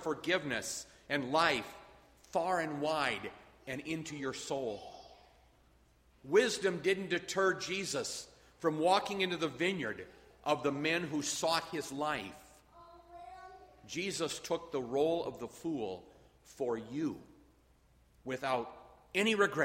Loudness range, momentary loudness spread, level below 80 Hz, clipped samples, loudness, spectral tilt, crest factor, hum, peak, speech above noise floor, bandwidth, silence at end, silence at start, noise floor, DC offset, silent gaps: 7 LU; 19 LU; -68 dBFS; under 0.1%; -35 LUFS; -3.5 dB/octave; 22 dB; none; -14 dBFS; 32 dB; 16 kHz; 0 s; 0 s; -67 dBFS; under 0.1%; none